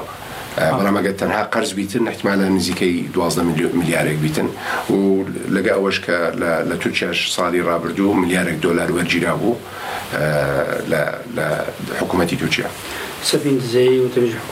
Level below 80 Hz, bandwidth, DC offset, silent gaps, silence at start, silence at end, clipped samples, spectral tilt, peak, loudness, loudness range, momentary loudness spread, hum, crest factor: -48 dBFS; 16 kHz; under 0.1%; none; 0 s; 0 s; under 0.1%; -5 dB/octave; -4 dBFS; -19 LUFS; 2 LU; 6 LU; none; 16 dB